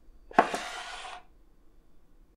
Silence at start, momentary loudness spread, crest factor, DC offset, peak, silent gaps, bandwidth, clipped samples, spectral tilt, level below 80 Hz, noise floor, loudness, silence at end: 0.05 s; 18 LU; 28 dB; under 0.1%; -6 dBFS; none; 15 kHz; under 0.1%; -3 dB/octave; -58 dBFS; -56 dBFS; -30 LUFS; 0.4 s